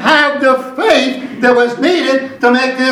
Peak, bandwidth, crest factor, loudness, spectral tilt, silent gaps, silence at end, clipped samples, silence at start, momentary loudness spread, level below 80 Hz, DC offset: 0 dBFS; 13.5 kHz; 12 dB; -12 LUFS; -3.5 dB/octave; none; 0 s; 0.1%; 0 s; 4 LU; -56 dBFS; under 0.1%